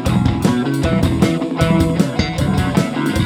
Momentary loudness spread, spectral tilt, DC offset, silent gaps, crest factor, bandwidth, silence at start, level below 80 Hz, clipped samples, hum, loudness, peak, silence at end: 3 LU; -6.5 dB/octave; under 0.1%; none; 16 dB; 16.5 kHz; 0 s; -30 dBFS; under 0.1%; none; -16 LUFS; 0 dBFS; 0 s